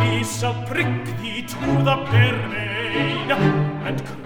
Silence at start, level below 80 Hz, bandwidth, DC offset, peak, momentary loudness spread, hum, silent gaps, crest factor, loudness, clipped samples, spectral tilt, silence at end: 0 s; -46 dBFS; 16.5 kHz; under 0.1%; -4 dBFS; 9 LU; none; none; 18 dB; -21 LUFS; under 0.1%; -5.5 dB/octave; 0 s